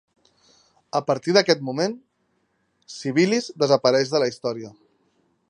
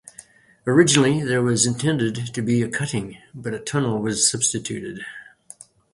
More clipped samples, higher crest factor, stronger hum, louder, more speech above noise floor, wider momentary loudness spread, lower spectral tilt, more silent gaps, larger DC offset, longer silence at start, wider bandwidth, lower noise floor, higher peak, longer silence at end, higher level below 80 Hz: neither; about the same, 22 dB vs 22 dB; neither; about the same, -22 LUFS vs -21 LUFS; first, 48 dB vs 27 dB; about the same, 15 LU vs 17 LU; about the same, -4.5 dB/octave vs -4 dB/octave; neither; neither; first, 0.95 s vs 0.2 s; about the same, 10.5 kHz vs 11.5 kHz; first, -70 dBFS vs -48 dBFS; about the same, -2 dBFS vs 0 dBFS; about the same, 0.8 s vs 0.7 s; second, -74 dBFS vs -56 dBFS